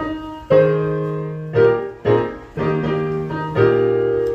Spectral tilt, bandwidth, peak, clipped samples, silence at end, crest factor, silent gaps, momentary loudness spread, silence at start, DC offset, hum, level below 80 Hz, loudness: -9 dB/octave; 6.6 kHz; -2 dBFS; under 0.1%; 0 s; 16 dB; none; 9 LU; 0 s; under 0.1%; none; -46 dBFS; -18 LUFS